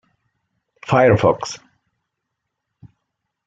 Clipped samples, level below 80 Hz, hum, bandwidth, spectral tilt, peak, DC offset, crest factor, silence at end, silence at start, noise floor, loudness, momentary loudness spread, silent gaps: under 0.1%; -52 dBFS; none; 8 kHz; -6.5 dB/octave; -2 dBFS; under 0.1%; 20 dB; 1.9 s; 0.9 s; -79 dBFS; -16 LUFS; 22 LU; none